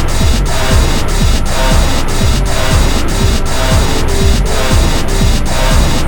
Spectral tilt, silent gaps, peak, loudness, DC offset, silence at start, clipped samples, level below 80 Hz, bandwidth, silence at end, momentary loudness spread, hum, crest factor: -4.5 dB/octave; none; 0 dBFS; -13 LUFS; under 0.1%; 0 s; 0.2%; -12 dBFS; over 20 kHz; 0 s; 2 LU; none; 10 dB